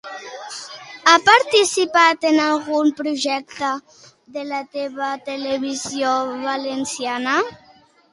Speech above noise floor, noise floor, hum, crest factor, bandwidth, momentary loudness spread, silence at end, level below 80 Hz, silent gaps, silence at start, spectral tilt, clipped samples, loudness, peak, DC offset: 33 dB; -52 dBFS; none; 20 dB; 11.5 kHz; 18 LU; 0.55 s; -66 dBFS; none; 0.05 s; -1.5 dB/octave; under 0.1%; -19 LUFS; 0 dBFS; under 0.1%